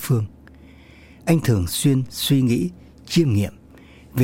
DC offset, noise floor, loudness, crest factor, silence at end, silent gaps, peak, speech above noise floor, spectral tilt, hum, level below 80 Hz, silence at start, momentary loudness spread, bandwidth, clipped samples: under 0.1%; -46 dBFS; -21 LUFS; 16 dB; 0 s; none; -6 dBFS; 27 dB; -6 dB/octave; none; -46 dBFS; 0 s; 11 LU; 16.5 kHz; under 0.1%